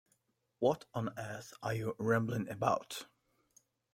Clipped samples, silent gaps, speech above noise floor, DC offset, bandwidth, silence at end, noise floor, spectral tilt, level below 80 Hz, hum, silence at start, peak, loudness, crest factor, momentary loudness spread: under 0.1%; none; 42 dB; under 0.1%; 16.5 kHz; 0.9 s; -78 dBFS; -6 dB/octave; -70 dBFS; none; 0.6 s; -14 dBFS; -37 LUFS; 24 dB; 12 LU